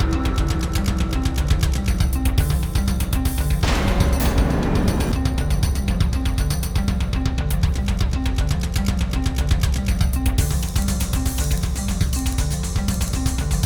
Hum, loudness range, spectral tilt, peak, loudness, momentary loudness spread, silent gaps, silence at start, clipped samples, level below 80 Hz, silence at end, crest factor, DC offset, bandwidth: none; 2 LU; -5.5 dB/octave; -4 dBFS; -22 LUFS; 3 LU; none; 0 s; under 0.1%; -22 dBFS; 0 s; 16 dB; under 0.1%; over 20 kHz